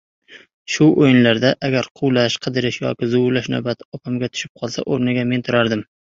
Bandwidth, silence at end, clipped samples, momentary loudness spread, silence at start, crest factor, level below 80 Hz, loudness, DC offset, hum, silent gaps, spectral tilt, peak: 7.6 kHz; 0.3 s; under 0.1%; 13 LU; 0.3 s; 16 dB; -56 dBFS; -18 LUFS; under 0.1%; none; 0.54-0.65 s, 1.91-1.95 s, 3.85-3.92 s, 4.49-4.55 s; -5.5 dB/octave; -2 dBFS